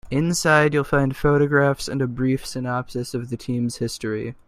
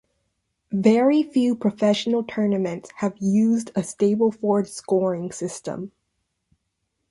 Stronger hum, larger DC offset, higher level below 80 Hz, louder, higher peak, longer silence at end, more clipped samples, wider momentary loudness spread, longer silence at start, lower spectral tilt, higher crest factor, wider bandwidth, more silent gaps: neither; neither; first, -44 dBFS vs -66 dBFS; about the same, -22 LUFS vs -22 LUFS; about the same, -2 dBFS vs -4 dBFS; second, 0.15 s vs 1.25 s; neither; about the same, 11 LU vs 11 LU; second, 0.05 s vs 0.7 s; about the same, -5.5 dB/octave vs -6 dB/octave; about the same, 20 dB vs 18 dB; first, 15 kHz vs 11.5 kHz; neither